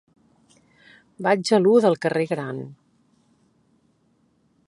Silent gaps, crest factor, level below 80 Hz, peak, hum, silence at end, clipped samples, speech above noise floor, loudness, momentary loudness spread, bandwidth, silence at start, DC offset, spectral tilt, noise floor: none; 20 dB; -72 dBFS; -6 dBFS; none; 1.95 s; under 0.1%; 44 dB; -21 LUFS; 16 LU; 11.5 kHz; 1.2 s; under 0.1%; -5.5 dB/octave; -64 dBFS